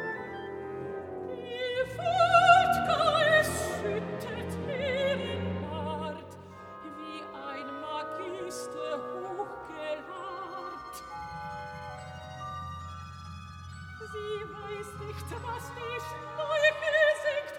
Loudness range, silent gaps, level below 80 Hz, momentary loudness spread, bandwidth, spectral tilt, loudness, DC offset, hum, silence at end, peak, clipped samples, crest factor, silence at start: 15 LU; none; -58 dBFS; 19 LU; 17.5 kHz; -4 dB/octave; -30 LUFS; under 0.1%; none; 0 s; -8 dBFS; under 0.1%; 24 dB; 0 s